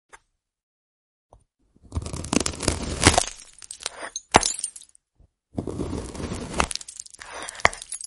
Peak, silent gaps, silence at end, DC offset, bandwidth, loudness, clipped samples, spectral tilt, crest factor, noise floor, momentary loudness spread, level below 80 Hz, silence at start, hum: 0 dBFS; 0.63-1.29 s; 0 s; under 0.1%; 11.5 kHz; -25 LUFS; under 0.1%; -3 dB/octave; 28 dB; -61 dBFS; 18 LU; -40 dBFS; 0.15 s; none